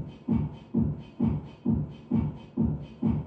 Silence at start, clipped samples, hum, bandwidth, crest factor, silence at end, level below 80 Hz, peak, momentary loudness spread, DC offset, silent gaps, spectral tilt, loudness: 0 s; under 0.1%; none; 4.8 kHz; 14 dB; 0 s; -42 dBFS; -16 dBFS; 2 LU; under 0.1%; none; -11.5 dB/octave; -30 LUFS